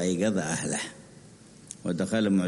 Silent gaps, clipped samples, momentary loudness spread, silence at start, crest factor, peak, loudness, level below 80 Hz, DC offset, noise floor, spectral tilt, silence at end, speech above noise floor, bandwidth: none; under 0.1%; 15 LU; 0 s; 16 dB; -14 dBFS; -29 LUFS; -62 dBFS; under 0.1%; -51 dBFS; -5 dB/octave; 0 s; 24 dB; 11.5 kHz